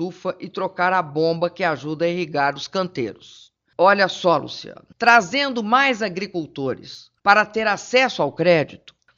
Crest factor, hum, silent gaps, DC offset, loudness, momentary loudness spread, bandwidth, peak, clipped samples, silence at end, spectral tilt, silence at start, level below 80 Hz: 20 dB; none; none; under 0.1%; -20 LUFS; 14 LU; 7.6 kHz; 0 dBFS; under 0.1%; 0.4 s; -4.5 dB/octave; 0 s; -64 dBFS